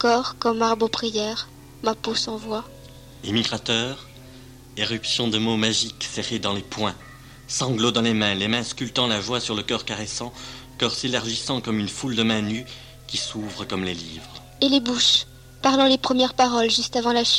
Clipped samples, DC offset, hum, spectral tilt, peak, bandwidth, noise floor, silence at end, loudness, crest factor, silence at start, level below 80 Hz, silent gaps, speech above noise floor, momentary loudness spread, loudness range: under 0.1%; under 0.1%; none; -3.5 dB/octave; -6 dBFS; 15.5 kHz; -44 dBFS; 0 s; -23 LUFS; 18 dB; 0 s; -52 dBFS; none; 21 dB; 14 LU; 6 LU